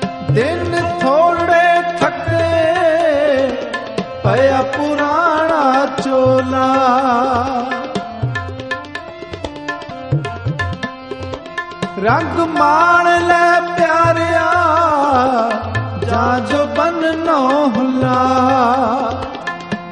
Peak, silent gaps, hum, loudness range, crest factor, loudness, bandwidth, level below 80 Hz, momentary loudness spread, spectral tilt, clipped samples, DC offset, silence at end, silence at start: 0 dBFS; none; none; 10 LU; 14 dB; -15 LUFS; 11 kHz; -44 dBFS; 13 LU; -6 dB/octave; under 0.1%; 0.1%; 0 s; 0 s